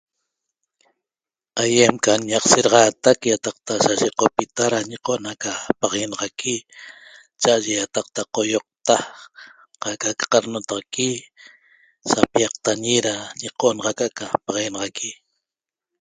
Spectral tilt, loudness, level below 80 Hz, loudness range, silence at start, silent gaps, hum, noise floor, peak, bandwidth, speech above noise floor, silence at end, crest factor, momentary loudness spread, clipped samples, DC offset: -2.5 dB/octave; -20 LUFS; -60 dBFS; 6 LU; 1.55 s; none; none; under -90 dBFS; 0 dBFS; 9.8 kHz; over 70 dB; 0.85 s; 22 dB; 13 LU; under 0.1%; under 0.1%